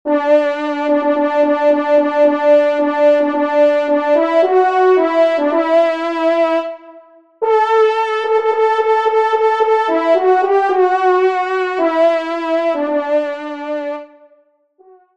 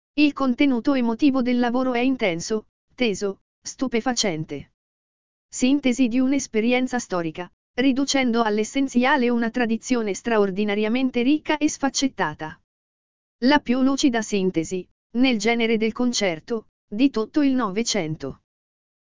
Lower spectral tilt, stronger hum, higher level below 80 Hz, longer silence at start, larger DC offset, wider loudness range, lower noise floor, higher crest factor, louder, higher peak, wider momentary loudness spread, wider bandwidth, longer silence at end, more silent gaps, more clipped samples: about the same, -3.5 dB/octave vs -4 dB/octave; neither; second, -70 dBFS vs -54 dBFS; about the same, 0.05 s vs 0.15 s; second, 0.2% vs 1%; about the same, 3 LU vs 3 LU; second, -54 dBFS vs under -90 dBFS; second, 12 dB vs 18 dB; first, -14 LUFS vs -22 LUFS; about the same, -2 dBFS vs -4 dBFS; second, 6 LU vs 11 LU; about the same, 8.2 kHz vs 7.6 kHz; first, 1.1 s vs 0.7 s; second, none vs 2.69-2.88 s, 3.41-3.62 s, 4.74-5.49 s, 7.53-7.74 s, 12.64-13.39 s, 14.91-15.10 s, 16.69-16.88 s; neither